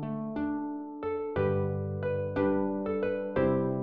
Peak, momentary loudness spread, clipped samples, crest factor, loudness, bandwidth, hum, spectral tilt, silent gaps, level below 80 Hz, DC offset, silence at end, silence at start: -14 dBFS; 7 LU; under 0.1%; 16 dB; -31 LUFS; 4.9 kHz; none; -8 dB/octave; none; -58 dBFS; 0.2%; 0 s; 0 s